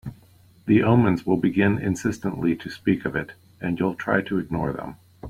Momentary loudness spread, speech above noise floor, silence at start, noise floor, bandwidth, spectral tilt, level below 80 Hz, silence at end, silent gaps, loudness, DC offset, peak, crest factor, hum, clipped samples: 14 LU; 31 dB; 0.05 s; -54 dBFS; 15.5 kHz; -7.5 dB/octave; -52 dBFS; 0 s; none; -23 LUFS; under 0.1%; -4 dBFS; 18 dB; none; under 0.1%